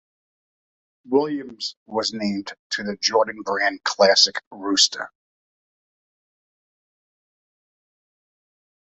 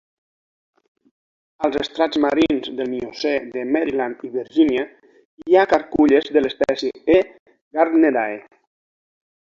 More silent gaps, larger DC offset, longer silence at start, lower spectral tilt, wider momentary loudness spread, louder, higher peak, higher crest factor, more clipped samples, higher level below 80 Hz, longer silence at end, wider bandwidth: second, 1.77-1.86 s, 2.59-2.70 s, 4.47-4.51 s vs 5.25-5.38 s, 7.39-7.46 s, 7.61-7.71 s; neither; second, 1.05 s vs 1.6 s; second, -2 dB/octave vs -5.5 dB/octave; first, 14 LU vs 11 LU; about the same, -21 LUFS vs -19 LUFS; about the same, -2 dBFS vs -2 dBFS; first, 24 dB vs 18 dB; neither; second, -70 dBFS vs -54 dBFS; first, 3.9 s vs 1.05 s; first, 8.2 kHz vs 7.4 kHz